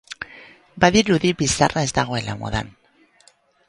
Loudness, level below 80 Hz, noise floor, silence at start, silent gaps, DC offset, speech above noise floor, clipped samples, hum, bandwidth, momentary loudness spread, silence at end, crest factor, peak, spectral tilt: -19 LUFS; -44 dBFS; -57 dBFS; 0.1 s; none; under 0.1%; 37 dB; under 0.1%; none; 11.5 kHz; 18 LU; 1 s; 22 dB; 0 dBFS; -4 dB/octave